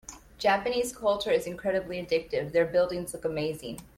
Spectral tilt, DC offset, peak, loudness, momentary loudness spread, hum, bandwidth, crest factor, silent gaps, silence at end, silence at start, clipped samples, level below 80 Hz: -4 dB/octave; under 0.1%; -12 dBFS; -28 LUFS; 7 LU; none; 16 kHz; 16 dB; none; 0.1 s; 0.1 s; under 0.1%; -56 dBFS